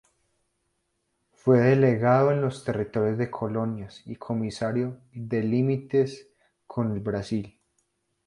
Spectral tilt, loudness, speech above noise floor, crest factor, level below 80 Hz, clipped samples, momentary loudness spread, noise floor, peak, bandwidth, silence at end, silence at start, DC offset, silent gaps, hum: -8.5 dB/octave; -25 LUFS; 51 dB; 18 dB; -58 dBFS; under 0.1%; 16 LU; -76 dBFS; -8 dBFS; 11 kHz; 0.8 s; 1.45 s; under 0.1%; none; none